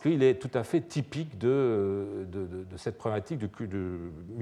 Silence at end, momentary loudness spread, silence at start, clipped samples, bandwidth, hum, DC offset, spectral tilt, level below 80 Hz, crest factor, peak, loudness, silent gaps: 0 s; 12 LU; 0 s; under 0.1%; 11.5 kHz; none; under 0.1%; -7.5 dB/octave; -60 dBFS; 18 dB; -12 dBFS; -31 LUFS; none